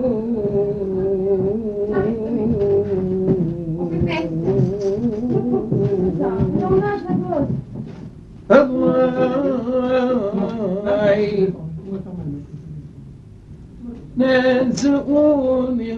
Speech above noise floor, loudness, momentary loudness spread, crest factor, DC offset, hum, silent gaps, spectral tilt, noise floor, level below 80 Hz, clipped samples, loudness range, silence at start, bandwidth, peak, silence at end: 22 dB; -19 LUFS; 15 LU; 18 dB; under 0.1%; none; none; -8 dB/octave; -39 dBFS; -42 dBFS; under 0.1%; 4 LU; 0 s; 8 kHz; -2 dBFS; 0 s